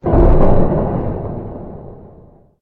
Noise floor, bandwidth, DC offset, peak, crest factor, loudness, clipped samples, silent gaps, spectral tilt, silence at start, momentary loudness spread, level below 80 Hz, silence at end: -44 dBFS; 2.9 kHz; under 0.1%; 0 dBFS; 14 dB; -16 LUFS; under 0.1%; none; -12 dB/octave; 0.05 s; 21 LU; -18 dBFS; 0.65 s